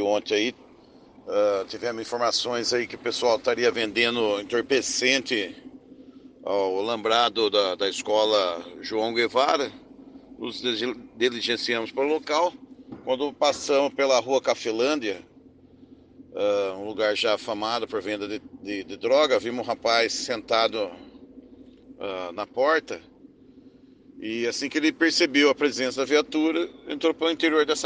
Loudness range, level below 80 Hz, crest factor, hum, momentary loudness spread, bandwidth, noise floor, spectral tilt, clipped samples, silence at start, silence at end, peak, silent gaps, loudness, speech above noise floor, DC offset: 4 LU; -66 dBFS; 20 dB; none; 12 LU; 10 kHz; -52 dBFS; -2.5 dB/octave; under 0.1%; 0 s; 0 s; -6 dBFS; none; -24 LUFS; 28 dB; under 0.1%